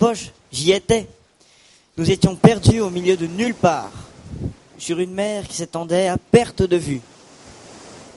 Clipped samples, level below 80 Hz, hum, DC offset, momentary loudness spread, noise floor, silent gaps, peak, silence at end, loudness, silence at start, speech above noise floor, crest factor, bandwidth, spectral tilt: under 0.1%; -42 dBFS; none; under 0.1%; 21 LU; -53 dBFS; none; 0 dBFS; 0.15 s; -19 LUFS; 0 s; 35 dB; 20 dB; 11.5 kHz; -5.5 dB/octave